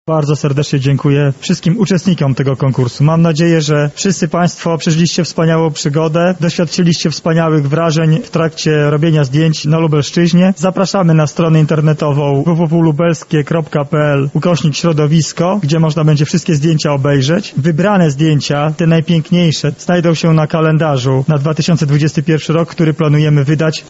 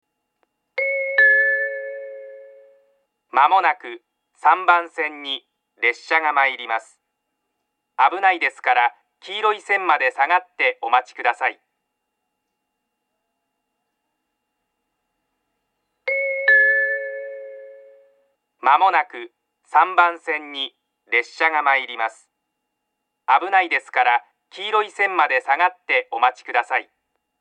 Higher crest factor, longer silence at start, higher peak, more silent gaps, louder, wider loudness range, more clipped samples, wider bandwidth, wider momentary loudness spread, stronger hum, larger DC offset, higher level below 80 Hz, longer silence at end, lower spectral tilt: second, 12 dB vs 22 dB; second, 0.05 s vs 0.75 s; about the same, 0 dBFS vs 0 dBFS; neither; first, -12 LUFS vs -19 LUFS; second, 1 LU vs 4 LU; neither; second, 8 kHz vs 9.6 kHz; second, 4 LU vs 15 LU; neither; neither; first, -46 dBFS vs under -90 dBFS; second, 0 s vs 0.6 s; first, -6.5 dB/octave vs -1 dB/octave